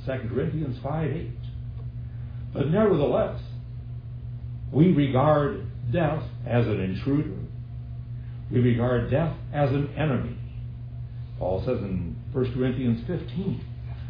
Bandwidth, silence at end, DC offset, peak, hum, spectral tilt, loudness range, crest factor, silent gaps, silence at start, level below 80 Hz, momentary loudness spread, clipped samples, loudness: 5.2 kHz; 0 s; under 0.1%; -8 dBFS; none; -11 dB/octave; 5 LU; 18 dB; none; 0 s; -42 dBFS; 16 LU; under 0.1%; -27 LUFS